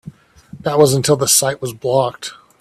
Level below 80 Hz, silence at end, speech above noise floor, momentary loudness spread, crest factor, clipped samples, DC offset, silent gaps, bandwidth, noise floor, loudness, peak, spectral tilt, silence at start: -52 dBFS; 0.25 s; 25 dB; 14 LU; 18 dB; under 0.1%; under 0.1%; none; 16 kHz; -41 dBFS; -15 LUFS; 0 dBFS; -3.5 dB/octave; 0.05 s